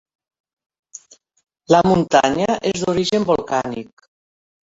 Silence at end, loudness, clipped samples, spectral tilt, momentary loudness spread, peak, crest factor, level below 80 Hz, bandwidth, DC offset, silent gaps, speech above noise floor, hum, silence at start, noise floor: 0.95 s; -17 LUFS; under 0.1%; -5 dB/octave; 8 LU; 0 dBFS; 20 dB; -50 dBFS; 8 kHz; under 0.1%; none; 27 dB; none; 1.7 s; -44 dBFS